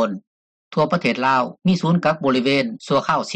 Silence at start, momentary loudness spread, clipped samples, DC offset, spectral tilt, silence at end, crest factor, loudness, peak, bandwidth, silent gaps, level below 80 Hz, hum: 0 s; 5 LU; under 0.1%; under 0.1%; -6 dB/octave; 0 s; 14 dB; -19 LUFS; -6 dBFS; 9 kHz; 0.27-0.71 s; -60 dBFS; none